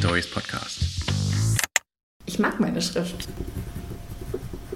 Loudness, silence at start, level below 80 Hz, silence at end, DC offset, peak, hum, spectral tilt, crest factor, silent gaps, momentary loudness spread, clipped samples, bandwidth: -27 LUFS; 0 s; -40 dBFS; 0 s; under 0.1%; -2 dBFS; none; -4 dB/octave; 26 dB; 2.03-2.20 s; 13 LU; under 0.1%; 16.5 kHz